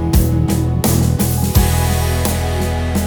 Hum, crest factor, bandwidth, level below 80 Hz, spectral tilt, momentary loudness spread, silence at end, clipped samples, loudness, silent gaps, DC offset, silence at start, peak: none; 14 dB; over 20 kHz; -20 dBFS; -5.5 dB/octave; 4 LU; 0 s; under 0.1%; -16 LUFS; none; under 0.1%; 0 s; 0 dBFS